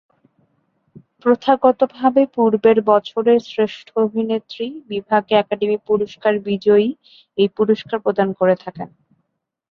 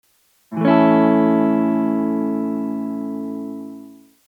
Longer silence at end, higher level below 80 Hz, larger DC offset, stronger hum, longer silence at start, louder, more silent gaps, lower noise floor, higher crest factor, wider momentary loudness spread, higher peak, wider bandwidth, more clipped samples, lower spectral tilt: first, 0.85 s vs 0.35 s; first, -62 dBFS vs -84 dBFS; neither; neither; first, 1.25 s vs 0.5 s; about the same, -18 LUFS vs -18 LUFS; neither; first, -72 dBFS vs -48 dBFS; about the same, 18 dB vs 18 dB; second, 11 LU vs 17 LU; about the same, 0 dBFS vs -2 dBFS; first, 6.6 kHz vs 4.6 kHz; neither; second, -7.5 dB/octave vs -9 dB/octave